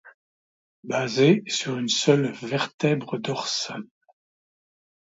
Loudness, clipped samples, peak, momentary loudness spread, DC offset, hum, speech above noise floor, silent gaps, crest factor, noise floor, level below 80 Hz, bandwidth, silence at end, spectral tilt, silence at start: -24 LUFS; under 0.1%; -6 dBFS; 10 LU; under 0.1%; none; over 66 dB; 0.14-0.83 s, 2.74-2.78 s; 20 dB; under -90 dBFS; -72 dBFS; 8 kHz; 1.2 s; -4.5 dB/octave; 0.05 s